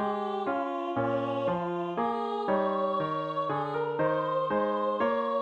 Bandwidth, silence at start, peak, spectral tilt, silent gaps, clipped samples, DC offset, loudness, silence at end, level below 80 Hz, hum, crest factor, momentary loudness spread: 7.2 kHz; 0 s; -16 dBFS; -8 dB/octave; none; under 0.1%; under 0.1%; -30 LUFS; 0 s; -68 dBFS; none; 14 dB; 3 LU